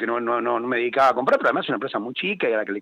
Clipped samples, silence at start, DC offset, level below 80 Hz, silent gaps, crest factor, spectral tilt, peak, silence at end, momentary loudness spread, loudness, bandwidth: under 0.1%; 0 s; under 0.1%; -70 dBFS; none; 14 dB; -5.5 dB/octave; -8 dBFS; 0 s; 7 LU; -22 LUFS; 11 kHz